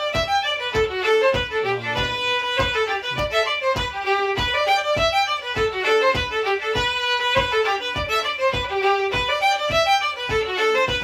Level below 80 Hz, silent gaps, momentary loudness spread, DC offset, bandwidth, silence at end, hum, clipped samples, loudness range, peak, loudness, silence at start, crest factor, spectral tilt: -40 dBFS; none; 4 LU; under 0.1%; 18.5 kHz; 0 s; none; under 0.1%; 1 LU; -6 dBFS; -20 LUFS; 0 s; 14 dB; -3 dB/octave